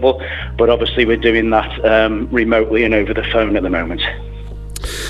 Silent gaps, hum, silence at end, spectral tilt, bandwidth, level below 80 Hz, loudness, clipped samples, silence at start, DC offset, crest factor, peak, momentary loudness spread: none; none; 0 s; -5.5 dB/octave; 14 kHz; -28 dBFS; -15 LUFS; under 0.1%; 0 s; under 0.1%; 14 dB; 0 dBFS; 13 LU